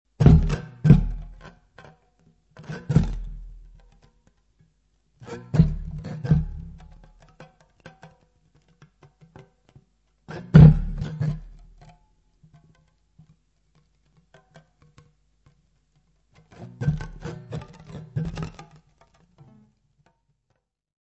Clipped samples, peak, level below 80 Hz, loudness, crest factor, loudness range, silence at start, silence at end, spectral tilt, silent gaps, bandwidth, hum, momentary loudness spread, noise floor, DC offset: under 0.1%; -2 dBFS; -34 dBFS; -21 LUFS; 24 dB; 17 LU; 0.2 s; 2.5 s; -9.5 dB/octave; none; 7.2 kHz; none; 25 LU; -75 dBFS; under 0.1%